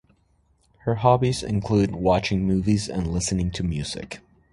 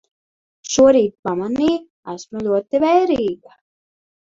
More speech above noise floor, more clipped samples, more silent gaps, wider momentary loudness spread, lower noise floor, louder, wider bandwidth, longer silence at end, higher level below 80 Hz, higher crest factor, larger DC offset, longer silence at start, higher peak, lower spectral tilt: second, 41 dB vs over 73 dB; neither; second, none vs 1.19-1.23 s, 1.90-2.03 s; second, 12 LU vs 20 LU; second, -64 dBFS vs under -90 dBFS; second, -23 LUFS vs -17 LUFS; first, 11.5 kHz vs 7.8 kHz; second, 0.35 s vs 0.9 s; first, -40 dBFS vs -54 dBFS; about the same, 20 dB vs 18 dB; neither; first, 0.85 s vs 0.65 s; about the same, -4 dBFS vs -2 dBFS; first, -6 dB/octave vs -4.5 dB/octave